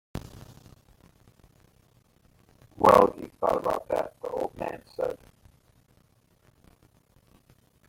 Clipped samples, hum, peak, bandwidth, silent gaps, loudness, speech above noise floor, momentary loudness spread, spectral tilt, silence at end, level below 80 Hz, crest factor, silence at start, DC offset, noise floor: under 0.1%; none; -4 dBFS; 16.5 kHz; none; -26 LUFS; 39 dB; 23 LU; -6 dB/octave; 2.75 s; -56 dBFS; 26 dB; 0.15 s; under 0.1%; -64 dBFS